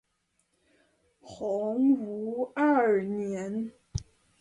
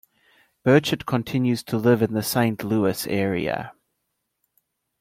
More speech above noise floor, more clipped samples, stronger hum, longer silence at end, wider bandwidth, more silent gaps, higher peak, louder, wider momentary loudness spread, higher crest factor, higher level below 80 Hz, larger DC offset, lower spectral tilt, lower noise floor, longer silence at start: second, 48 dB vs 55 dB; neither; neither; second, 0.4 s vs 1.3 s; second, 8.8 kHz vs 16.5 kHz; neither; second, -14 dBFS vs -4 dBFS; second, -29 LUFS vs -22 LUFS; first, 14 LU vs 7 LU; about the same, 16 dB vs 20 dB; about the same, -56 dBFS vs -58 dBFS; neither; about the same, -7 dB/octave vs -6 dB/octave; about the same, -75 dBFS vs -77 dBFS; first, 1.25 s vs 0.65 s